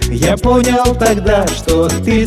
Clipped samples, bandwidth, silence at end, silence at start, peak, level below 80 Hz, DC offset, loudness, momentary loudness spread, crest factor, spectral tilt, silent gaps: under 0.1%; 14.5 kHz; 0 s; 0 s; 0 dBFS; -22 dBFS; under 0.1%; -12 LUFS; 3 LU; 12 dB; -5 dB/octave; none